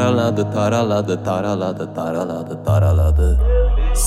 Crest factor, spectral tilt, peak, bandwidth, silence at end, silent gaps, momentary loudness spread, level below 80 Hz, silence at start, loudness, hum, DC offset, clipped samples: 12 dB; -6.5 dB/octave; -4 dBFS; 14 kHz; 0 s; none; 8 LU; -20 dBFS; 0 s; -18 LUFS; none; under 0.1%; under 0.1%